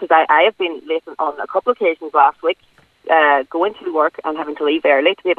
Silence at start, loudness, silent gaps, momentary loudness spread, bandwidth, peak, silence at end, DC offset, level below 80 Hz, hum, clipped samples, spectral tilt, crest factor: 0 s; -17 LUFS; none; 11 LU; 4.7 kHz; 0 dBFS; 0.05 s; under 0.1%; -68 dBFS; none; under 0.1%; -5 dB/octave; 16 dB